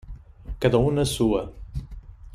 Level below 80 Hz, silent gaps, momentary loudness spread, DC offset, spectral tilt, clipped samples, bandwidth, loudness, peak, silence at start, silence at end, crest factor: -38 dBFS; none; 23 LU; under 0.1%; -6 dB/octave; under 0.1%; 15.5 kHz; -23 LUFS; -6 dBFS; 0.05 s; 0 s; 20 dB